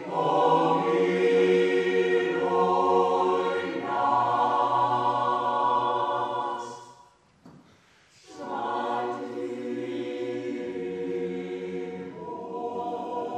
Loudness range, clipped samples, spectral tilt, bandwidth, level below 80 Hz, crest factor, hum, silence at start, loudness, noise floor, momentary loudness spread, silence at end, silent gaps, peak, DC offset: 10 LU; under 0.1%; -6 dB/octave; 9.4 kHz; -76 dBFS; 16 dB; none; 0 s; -26 LUFS; -59 dBFS; 12 LU; 0 s; none; -10 dBFS; under 0.1%